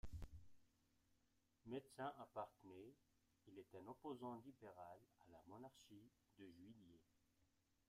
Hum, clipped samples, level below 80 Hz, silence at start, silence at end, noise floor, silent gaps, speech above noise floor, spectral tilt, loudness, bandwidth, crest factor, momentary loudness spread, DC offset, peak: none; under 0.1%; -72 dBFS; 0.05 s; 0.45 s; -84 dBFS; none; 26 dB; -6.5 dB/octave; -59 LUFS; 15.5 kHz; 20 dB; 14 LU; under 0.1%; -40 dBFS